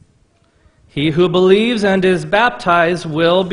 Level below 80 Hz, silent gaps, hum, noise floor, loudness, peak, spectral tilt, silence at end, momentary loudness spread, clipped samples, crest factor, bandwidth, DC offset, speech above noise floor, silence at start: -48 dBFS; none; none; -55 dBFS; -14 LUFS; 0 dBFS; -6 dB/octave; 0 s; 6 LU; under 0.1%; 14 dB; 10.5 kHz; under 0.1%; 42 dB; 0.95 s